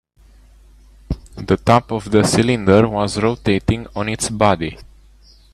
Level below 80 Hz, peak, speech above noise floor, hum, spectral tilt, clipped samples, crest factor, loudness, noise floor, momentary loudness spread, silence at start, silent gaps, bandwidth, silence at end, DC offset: -38 dBFS; 0 dBFS; 32 dB; none; -5.5 dB/octave; under 0.1%; 18 dB; -17 LUFS; -48 dBFS; 14 LU; 1.1 s; none; 13.5 kHz; 0.7 s; under 0.1%